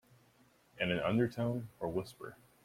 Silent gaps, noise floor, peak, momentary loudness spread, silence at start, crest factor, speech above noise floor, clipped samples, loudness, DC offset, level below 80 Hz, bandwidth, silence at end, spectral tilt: none; -68 dBFS; -18 dBFS; 17 LU; 0.75 s; 20 dB; 32 dB; under 0.1%; -36 LUFS; under 0.1%; -66 dBFS; 16 kHz; 0.3 s; -7 dB/octave